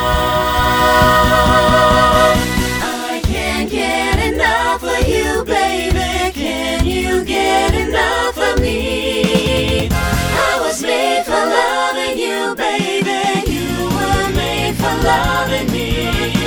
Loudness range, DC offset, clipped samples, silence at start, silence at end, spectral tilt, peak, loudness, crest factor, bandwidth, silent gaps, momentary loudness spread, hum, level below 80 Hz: 4 LU; under 0.1%; under 0.1%; 0 s; 0 s; -4.5 dB/octave; 0 dBFS; -15 LUFS; 14 dB; over 20 kHz; none; 7 LU; none; -24 dBFS